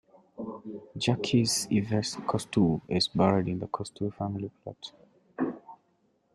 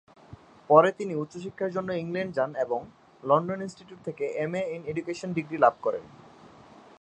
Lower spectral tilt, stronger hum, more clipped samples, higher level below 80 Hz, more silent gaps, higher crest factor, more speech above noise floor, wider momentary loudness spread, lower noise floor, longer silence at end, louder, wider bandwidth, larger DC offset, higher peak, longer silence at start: second, -5 dB/octave vs -7 dB/octave; neither; neither; first, -62 dBFS vs -68 dBFS; neither; about the same, 20 dB vs 24 dB; first, 42 dB vs 25 dB; about the same, 17 LU vs 16 LU; first, -70 dBFS vs -52 dBFS; about the same, 0.6 s vs 0.55 s; about the same, -29 LUFS vs -27 LUFS; first, 13.5 kHz vs 9.6 kHz; neither; second, -10 dBFS vs -4 dBFS; about the same, 0.4 s vs 0.3 s